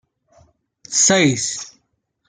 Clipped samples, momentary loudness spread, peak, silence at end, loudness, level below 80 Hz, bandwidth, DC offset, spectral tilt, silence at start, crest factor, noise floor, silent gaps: under 0.1%; 17 LU; -2 dBFS; 0.6 s; -16 LUFS; -60 dBFS; 10.5 kHz; under 0.1%; -2.5 dB/octave; 0.9 s; 18 dB; -69 dBFS; none